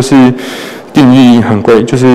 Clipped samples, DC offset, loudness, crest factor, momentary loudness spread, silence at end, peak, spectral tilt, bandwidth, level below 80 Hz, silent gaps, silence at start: 0.6%; under 0.1%; -6 LUFS; 6 dB; 15 LU; 0 s; 0 dBFS; -6.5 dB/octave; 13 kHz; -40 dBFS; none; 0 s